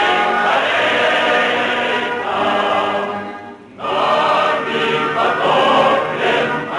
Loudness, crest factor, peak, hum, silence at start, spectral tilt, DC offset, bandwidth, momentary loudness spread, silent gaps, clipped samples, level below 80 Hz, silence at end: -15 LUFS; 14 dB; -2 dBFS; none; 0 s; -4 dB/octave; under 0.1%; 11.5 kHz; 8 LU; none; under 0.1%; -58 dBFS; 0 s